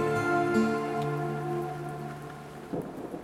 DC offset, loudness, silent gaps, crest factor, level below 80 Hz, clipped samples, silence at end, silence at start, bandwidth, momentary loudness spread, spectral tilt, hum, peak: under 0.1%; -31 LUFS; none; 18 dB; -60 dBFS; under 0.1%; 0 s; 0 s; 16 kHz; 14 LU; -7 dB/octave; none; -14 dBFS